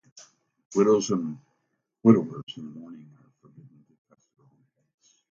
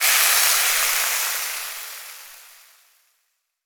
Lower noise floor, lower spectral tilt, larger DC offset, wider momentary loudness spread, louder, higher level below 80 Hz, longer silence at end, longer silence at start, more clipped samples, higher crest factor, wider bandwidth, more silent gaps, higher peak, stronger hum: first, -77 dBFS vs -72 dBFS; first, -6.5 dB/octave vs 5 dB/octave; neither; first, 24 LU vs 21 LU; second, -24 LUFS vs -18 LUFS; about the same, -70 dBFS vs -66 dBFS; first, 2.35 s vs 1.25 s; first, 0.7 s vs 0 s; neither; about the same, 24 dB vs 20 dB; second, 7.6 kHz vs over 20 kHz; first, 2.43-2.47 s vs none; about the same, -4 dBFS vs -2 dBFS; neither